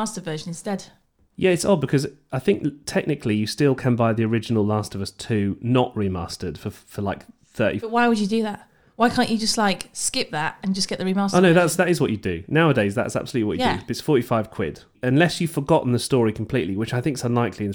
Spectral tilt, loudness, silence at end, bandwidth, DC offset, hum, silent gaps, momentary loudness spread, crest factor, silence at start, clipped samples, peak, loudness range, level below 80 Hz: -5.5 dB/octave; -22 LUFS; 0 s; 20 kHz; under 0.1%; none; none; 11 LU; 18 dB; 0 s; under 0.1%; -4 dBFS; 4 LU; -52 dBFS